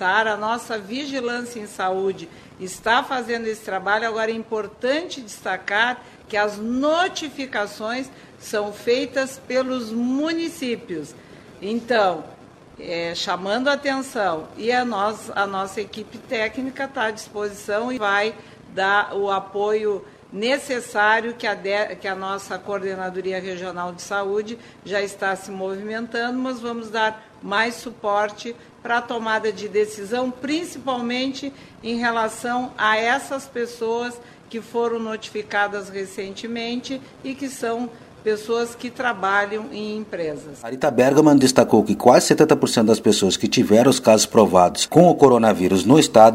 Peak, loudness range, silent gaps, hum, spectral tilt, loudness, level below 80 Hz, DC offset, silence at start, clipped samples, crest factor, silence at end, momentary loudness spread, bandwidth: 0 dBFS; 11 LU; none; none; -4 dB/octave; -21 LUFS; -58 dBFS; under 0.1%; 0 s; under 0.1%; 22 dB; 0 s; 15 LU; 16 kHz